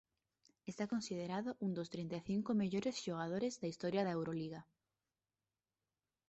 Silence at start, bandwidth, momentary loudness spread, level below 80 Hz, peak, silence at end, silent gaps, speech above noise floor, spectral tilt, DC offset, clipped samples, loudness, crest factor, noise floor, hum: 0.65 s; 8 kHz; 8 LU; -76 dBFS; -26 dBFS; 1.65 s; none; over 49 dB; -6 dB/octave; under 0.1%; under 0.1%; -41 LUFS; 16 dB; under -90 dBFS; none